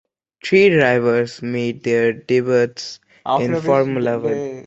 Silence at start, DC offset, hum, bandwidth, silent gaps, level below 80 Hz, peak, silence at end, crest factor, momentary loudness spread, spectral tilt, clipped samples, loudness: 0.45 s; under 0.1%; none; 8 kHz; none; -58 dBFS; -2 dBFS; 0.05 s; 16 dB; 10 LU; -6 dB/octave; under 0.1%; -17 LUFS